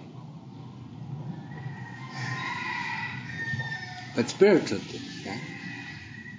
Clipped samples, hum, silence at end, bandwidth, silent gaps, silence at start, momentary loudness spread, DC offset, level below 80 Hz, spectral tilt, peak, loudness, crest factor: under 0.1%; none; 0 s; 7.6 kHz; none; 0 s; 21 LU; under 0.1%; -62 dBFS; -5.5 dB/octave; -6 dBFS; -30 LUFS; 24 dB